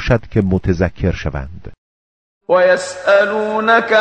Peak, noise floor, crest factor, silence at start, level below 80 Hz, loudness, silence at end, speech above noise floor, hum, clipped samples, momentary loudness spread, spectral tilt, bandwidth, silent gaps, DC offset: 0 dBFS; under -90 dBFS; 16 dB; 0 s; -32 dBFS; -15 LUFS; 0 s; over 75 dB; none; under 0.1%; 12 LU; -6 dB/octave; 9.6 kHz; 1.78-2.41 s; under 0.1%